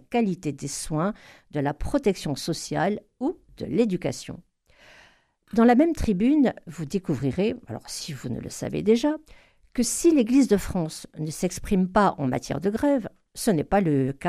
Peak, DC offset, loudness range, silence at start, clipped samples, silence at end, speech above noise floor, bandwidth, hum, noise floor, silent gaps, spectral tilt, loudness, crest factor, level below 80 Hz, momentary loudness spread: -8 dBFS; under 0.1%; 4 LU; 0.1 s; under 0.1%; 0 s; 34 dB; 14.5 kHz; none; -58 dBFS; none; -5.5 dB/octave; -25 LUFS; 18 dB; -44 dBFS; 13 LU